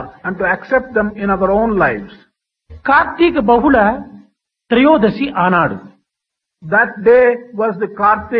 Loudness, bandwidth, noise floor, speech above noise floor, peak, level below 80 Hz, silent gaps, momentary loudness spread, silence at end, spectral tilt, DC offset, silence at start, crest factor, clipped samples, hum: -14 LUFS; 5.4 kHz; -80 dBFS; 67 dB; 0 dBFS; -42 dBFS; none; 9 LU; 0 s; -9 dB/octave; under 0.1%; 0 s; 14 dB; under 0.1%; none